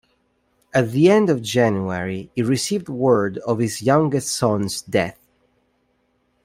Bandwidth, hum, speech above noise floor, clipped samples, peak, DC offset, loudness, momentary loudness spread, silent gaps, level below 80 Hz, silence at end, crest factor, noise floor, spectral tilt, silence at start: 16 kHz; none; 47 dB; under 0.1%; -2 dBFS; under 0.1%; -20 LUFS; 9 LU; none; -58 dBFS; 1.35 s; 18 dB; -66 dBFS; -5.5 dB/octave; 0.75 s